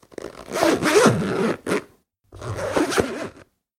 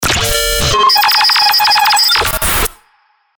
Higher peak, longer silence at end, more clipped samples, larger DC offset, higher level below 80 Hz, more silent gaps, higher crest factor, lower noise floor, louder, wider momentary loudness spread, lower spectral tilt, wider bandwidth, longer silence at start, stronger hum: about the same, -2 dBFS vs 0 dBFS; second, 0.35 s vs 0.65 s; neither; neither; second, -50 dBFS vs -26 dBFS; neither; first, 22 dB vs 12 dB; about the same, -54 dBFS vs -55 dBFS; second, -21 LUFS vs -9 LUFS; first, 20 LU vs 5 LU; first, -4.5 dB/octave vs -1 dB/octave; second, 16.5 kHz vs over 20 kHz; first, 0.2 s vs 0 s; neither